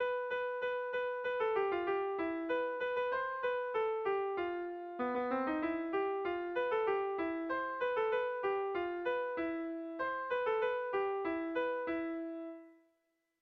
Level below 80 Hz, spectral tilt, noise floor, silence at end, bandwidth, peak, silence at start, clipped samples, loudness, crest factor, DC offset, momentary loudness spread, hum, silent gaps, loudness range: -72 dBFS; -2 dB/octave; -81 dBFS; 0.7 s; 6 kHz; -24 dBFS; 0 s; under 0.1%; -36 LUFS; 12 dB; under 0.1%; 5 LU; none; none; 1 LU